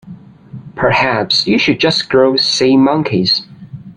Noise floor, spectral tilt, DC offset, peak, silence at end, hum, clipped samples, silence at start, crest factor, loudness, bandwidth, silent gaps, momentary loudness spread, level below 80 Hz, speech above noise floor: -35 dBFS; -4.5 dB/octave; under 0.1%; 0 dBFS; 0.05 s; none; under 0.1%; 0.05 s; 14 dB; -12 LUFS; 10.5 kHz; none; 7 LU; -50 dBFS; 23 dB